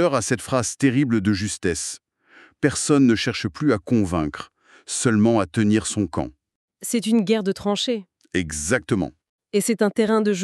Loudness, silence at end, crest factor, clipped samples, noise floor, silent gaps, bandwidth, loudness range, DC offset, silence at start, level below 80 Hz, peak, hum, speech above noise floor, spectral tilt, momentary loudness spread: -22 LUFS; 0 s; 18 dB; under 0.1%; -53 dBFS; 6.55-6.68 s, 9.29-9.39 s; 13.5 kHz; 3 LU; under 0.1%; 0 s; -50 dBFS; -4 dBFS; none; 32 dB; -5 dB/octave; 11 LU